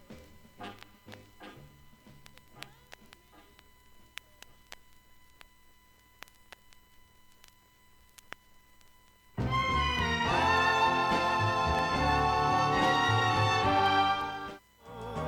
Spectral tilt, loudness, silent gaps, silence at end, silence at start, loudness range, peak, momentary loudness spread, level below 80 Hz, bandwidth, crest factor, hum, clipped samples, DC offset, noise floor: -4.5 dB/octave; -27 LUFS; none; 0 s; 0.1 s; 22 LU; -14 dBFS; 25 LU; -48 dBFS; 17.5 kHz; 18 dB; none; under 0.1%; under 0.1%; -61 dBFS